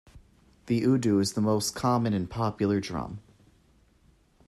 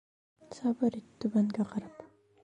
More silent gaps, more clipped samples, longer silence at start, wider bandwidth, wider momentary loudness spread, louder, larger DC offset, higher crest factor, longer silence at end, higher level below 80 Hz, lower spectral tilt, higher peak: neither; neither; second, 0.15 s vs 0.5 s; first, 14 kHz vs 9.6 kHz; second, 11 LU vs 21 LU; first, -27 LUFS vs -33 LUFS; neither; about the same, 16 dB vs 16 dB; first, 1.25 s vs 0.35 s; first, -56 dBFS vs -72 dBFS; second, -6 dB/octave vs -8 dB/octave; first, -12 dBFS vs -18 dBFS